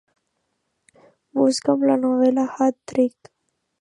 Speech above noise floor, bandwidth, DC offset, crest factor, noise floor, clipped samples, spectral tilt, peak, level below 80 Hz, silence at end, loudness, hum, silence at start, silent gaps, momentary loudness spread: 55 dB; 11 kHz; under 0.1%; 18 dB; -74 dBFS; under 0.1%; -5 dB/octave; -4 dBFS; -72 dBFS; 0.7 s; -20 LUFS; none; 1.35 s; none; 4 LU